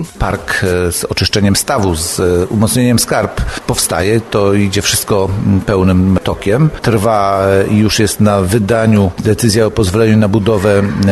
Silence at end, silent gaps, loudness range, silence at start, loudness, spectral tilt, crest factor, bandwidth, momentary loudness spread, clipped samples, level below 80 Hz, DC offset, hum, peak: 0 s; none; 2 LU; 0 s; -12 LUFS; -5 dB/octave; 12 dB; 13 kHz; 4 LU; under 0.1%; -30 dBFS; 0.2%; none; 0 dBFS